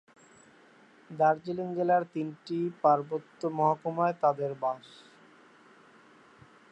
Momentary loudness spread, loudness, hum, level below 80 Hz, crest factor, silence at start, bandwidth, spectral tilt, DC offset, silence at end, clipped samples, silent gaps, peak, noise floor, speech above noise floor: 10 LU; -29 LUFS; none; -82 dBFS; 20 dB; 1.1 s; 8.6 kHz; -8 dB/octave; under 0.1%; 1.85 s; under 0.1%; none; -12 dBFS; -58 dBFS; 30 dB